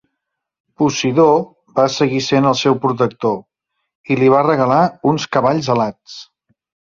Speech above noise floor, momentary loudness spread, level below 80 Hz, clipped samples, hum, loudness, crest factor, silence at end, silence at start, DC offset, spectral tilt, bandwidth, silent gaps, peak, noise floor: 63 dB; 10 LU; -56 dBFS; under 0.1%; none; -15 LUFS; 14 dB; 0.7 s; 0.8 s; under 0.1%; -5.5 dB/octave; 7.6 kHz; 3.95-4.04 s; -2 dBFS; -78 dBFS